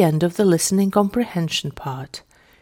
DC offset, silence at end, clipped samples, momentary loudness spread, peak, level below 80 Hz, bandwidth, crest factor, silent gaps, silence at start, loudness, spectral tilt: under 0.1%; 0.4 s; under 0.1%; 15 LU; -4 dBFS; -52 dBFS; 17 kHz; 16 dB; none; 0 s; -20 LUFS; -5 dB/octave